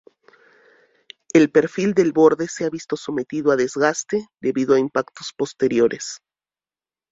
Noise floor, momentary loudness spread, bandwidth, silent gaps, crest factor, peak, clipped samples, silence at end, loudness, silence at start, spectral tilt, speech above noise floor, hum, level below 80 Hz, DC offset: under -90 dBFS; 12 LU; 7.8 kHz; none; 18 dB; -2 dBFS; under 0.1%; 0.95 s; -20 LUFS; 1.35 s; -5 dB/octave; over 71 dB; none; -62 dBFS; under 0.1%